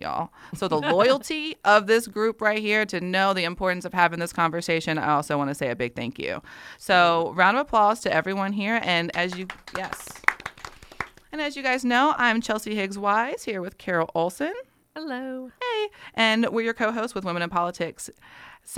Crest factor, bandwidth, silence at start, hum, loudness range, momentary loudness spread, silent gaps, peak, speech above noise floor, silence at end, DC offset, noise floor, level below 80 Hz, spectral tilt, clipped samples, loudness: 24 dB; 16.5 kHz; 0 s; none; 5 LU; 15 LU; none; 0 dBFS; 19 dB; 0 s; under 0.1%; -44 dBFS; -58 dBFS; -4.5 dB/octave; under 0.1%; -24 LUFS